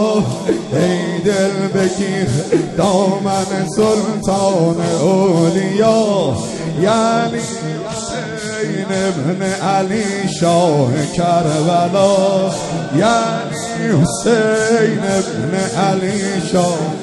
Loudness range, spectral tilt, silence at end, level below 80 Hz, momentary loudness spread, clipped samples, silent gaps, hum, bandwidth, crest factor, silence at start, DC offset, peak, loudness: 3 LU; -5.5 dB/octave; 0 s; -46 dBFS; 7 LU; under 0.1%; none; none; 12 kHz; 14 dB; 0 s; under 0.1%; 0 dBFS; -16 LUFS